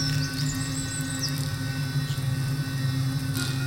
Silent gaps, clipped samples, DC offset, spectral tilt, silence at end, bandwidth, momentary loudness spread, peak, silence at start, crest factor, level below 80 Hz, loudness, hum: none; under 0.1%; under 0.1%; -4.5 dB/octave; 0 s; 17 kHz; 2 LU; -12 dBFS; 0 s; 14 dB; -46 dBFS; -28 LUFS; none